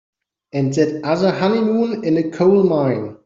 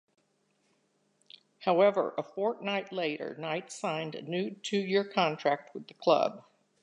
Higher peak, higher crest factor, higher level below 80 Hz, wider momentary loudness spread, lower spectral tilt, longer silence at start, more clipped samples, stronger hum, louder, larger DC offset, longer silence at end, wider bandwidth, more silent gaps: first, -2 dBFS vs -10 dBFS; second, 14 dB vs 20 dB; first, -58 dBFS vs -86 dBFS; second, 6 LU vs 10 LU; first, -7.5 dB/octave vs -5 dB/octave; second, 0.55 s vs 1.6 s; neither; neither; first, -17 LUFS vs -31 LUFS; neither; second, 0.1 s vs 0.45 s; second, 7.6 kHz vs 11 kHz; neither